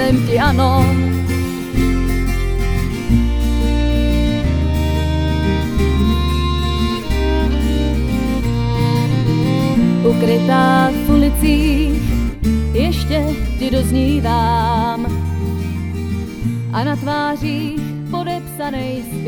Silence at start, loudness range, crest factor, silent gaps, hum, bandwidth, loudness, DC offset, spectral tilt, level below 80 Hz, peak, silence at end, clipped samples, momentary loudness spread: 0 s; 5 LU; 14 dB; none; none; over 20 kHz; -17 LUFS; under 0.1%; -6.5 dB/octave; -20 dBFS; 0 dBFS; 0 s; under 0.1%; 8 LU